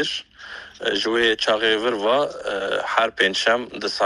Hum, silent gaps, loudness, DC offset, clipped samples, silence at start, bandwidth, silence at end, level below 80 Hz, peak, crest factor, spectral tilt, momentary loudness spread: none; none; -21 LUFS; under 0.1%; under 0.1%; 0 s; 11.5 kHz; 0 s; -58 dBFS; -2 dBFS; 20 dB; -2.5 dB/octave; 10 LU